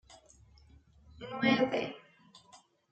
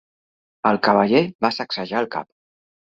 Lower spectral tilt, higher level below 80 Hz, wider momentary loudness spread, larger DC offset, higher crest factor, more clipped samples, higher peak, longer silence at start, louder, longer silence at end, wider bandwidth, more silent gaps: about the same, -5.5 dB/octave vs -6.5 dB/octave; about the same, -66 dBFS vs -62 dBFS; first, 22 LU vs 10 LU; neither; about the same, 22 dB vs 20 dB; neither; second, -14 dBFS vs -2 dBFS; second, 0.1 s vs 0.65 s; second, -31 LUFS vs -20 LUFS; second, 0.35 s vs 0.7 s; first, 8.8 kHz vs 7.4 kHz; second, none vs 1.35-1.39 s